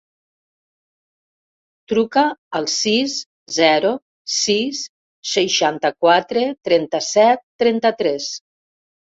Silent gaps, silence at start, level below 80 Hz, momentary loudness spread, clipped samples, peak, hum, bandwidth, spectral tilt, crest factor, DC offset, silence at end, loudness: 2.38-2.51 s, 3.26-3.46 s, 4.02-4.25 s, 4.89-5.23 s, 7.43-7.59 s; 1.9 s; -64 dBFS; 11 LU; under 0.1%; -2 dBFS; none; 8 kHz; -2.5 dB/octave; 18 dB; under 0.1%; 0.8 s; -18 LUFS